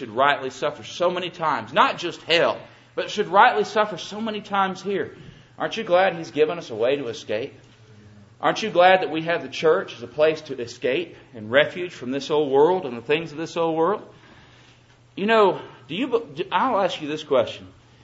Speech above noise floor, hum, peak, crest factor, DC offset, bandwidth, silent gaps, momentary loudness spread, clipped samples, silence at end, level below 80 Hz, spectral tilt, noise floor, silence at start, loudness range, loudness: 31 dB; none; -2 dBFS; 22 dB; under 0.1%; 8 kHz; none; 12 LU; under 0.1%; 0.35 s; -66 dBFS; -4.5 dB/octave; -53 dBFS; 0 s; 3 LU; -22 LUFS